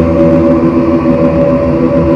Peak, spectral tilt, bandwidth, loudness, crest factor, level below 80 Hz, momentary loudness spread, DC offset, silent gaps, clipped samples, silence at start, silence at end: 0 dBFS; -10 dB/octave; 6.6 kHz; -9 LUFS; 8 dB; -28 dBFS; 2 LU; under 0.1%; none; 0.7%; 0 s; 0 s